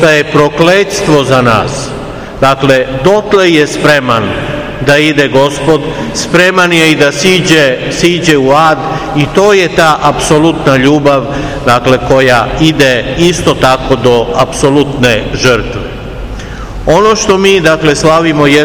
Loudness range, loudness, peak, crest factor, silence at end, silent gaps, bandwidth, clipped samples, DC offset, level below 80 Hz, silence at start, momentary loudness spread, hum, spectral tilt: 2 LU; -8 LUFS; 0 dBFS; 8 dB; 0 s; none; over 20 kHz; 6%; 0.8%; -28 dBFS; 0 s; 9 LU; none; -4.5 dB/octave